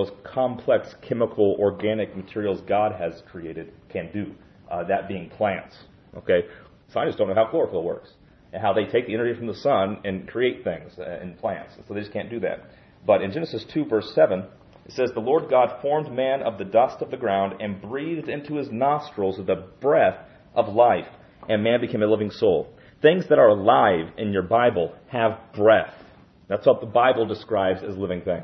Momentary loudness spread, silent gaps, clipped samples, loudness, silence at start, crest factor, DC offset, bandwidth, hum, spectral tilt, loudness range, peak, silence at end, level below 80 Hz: 15 LU; none; under 0.1%; -23 LUFS; 0 s; 20 dB; under 0.1%; 6.2 kHz; none; -8 dB/octave; 8 LU; -4 dBFS; 0 s; -62 dBFS